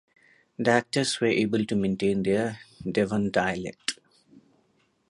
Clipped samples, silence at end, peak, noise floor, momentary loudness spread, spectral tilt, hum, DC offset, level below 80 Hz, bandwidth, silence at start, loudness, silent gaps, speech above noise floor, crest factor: under 0.1%; 0.7 s; -6 dBFS; -68 dBFS; 9 LU; -5 dB/octave; none; under 0.1%; -58 dBFS; 11.5 kHz; 0.6 s; -26 LUFS; none; 43 dB; 22 dB